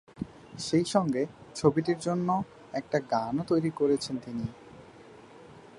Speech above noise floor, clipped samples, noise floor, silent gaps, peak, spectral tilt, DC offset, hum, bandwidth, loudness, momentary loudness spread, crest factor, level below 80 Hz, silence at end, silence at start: 23 dB; under 0.1%; -51 dBFS; none; -8 dBFS; -6 dB/octave; under 0.1%; none; 11.5 kHz; -29 LUFS; 13 LU; 22 dB; -62 dBFS; 0 s; 0.15 s